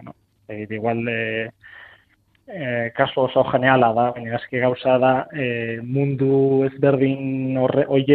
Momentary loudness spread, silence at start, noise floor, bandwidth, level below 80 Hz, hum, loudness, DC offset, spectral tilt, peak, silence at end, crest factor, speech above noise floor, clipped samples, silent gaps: 11 LU; 0.05 s; -60 dBFS; 4.4 kHz; -60 dBFS; none; -20 LUFS; under 0.1%; -10 dB/octave; -2 dBFS; 0 s; 20 dB; 41 dB; under 0.1%; none